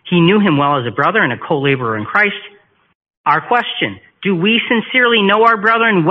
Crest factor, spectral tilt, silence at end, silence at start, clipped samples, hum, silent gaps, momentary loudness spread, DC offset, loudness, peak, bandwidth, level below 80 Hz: 14 dB; -3 dB/octave; 0 s; 0.05 s; under 0.1%; none; 2.95-3.01 s, 3.17-3.24 s; 8 LU; under 0.1%; -13 LUFS; 0 dBFS; 5.8 kHz; -56 dBFS